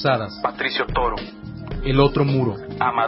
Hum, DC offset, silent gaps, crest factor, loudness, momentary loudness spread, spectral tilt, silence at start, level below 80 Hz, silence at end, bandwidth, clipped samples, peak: none; under 0.1%; none; 20 dB; -21 LUFS; 14 LU; -10.5 dB/octave; 0 s; -34 dBFS; 0 s; 5.8 kHz; under 0.1%; -2 dBFS